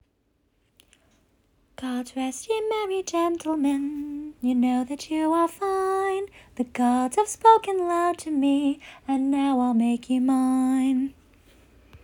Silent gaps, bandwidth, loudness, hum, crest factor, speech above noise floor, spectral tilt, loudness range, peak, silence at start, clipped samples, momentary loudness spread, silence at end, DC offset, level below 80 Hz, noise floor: none; 17 kHz; -24 LUFS; none; 20 dB; 46 dB; -4 dB/octave; 6 LU; -4 dBFS; 1.8 s; under 0.1%; 10 LU; 0.05 s; under 0.1%; -60 dBFS; -69 dBFS